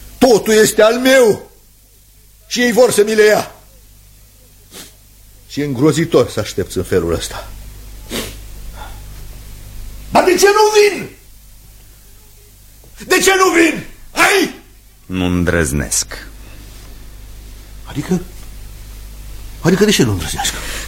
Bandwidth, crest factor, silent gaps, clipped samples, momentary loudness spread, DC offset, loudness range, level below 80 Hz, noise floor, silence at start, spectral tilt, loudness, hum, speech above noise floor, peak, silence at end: 16.5 kHz; 16 dB; none; under 0.1%; 25 LU; under 0.1%; 9 LU; -34 dBFS; -46 dBFS; 0 s; -4 dB/octave; -13 LUFS; 50 Hz at -40 dBFS; 33 dB; 0 dBFS; 0 s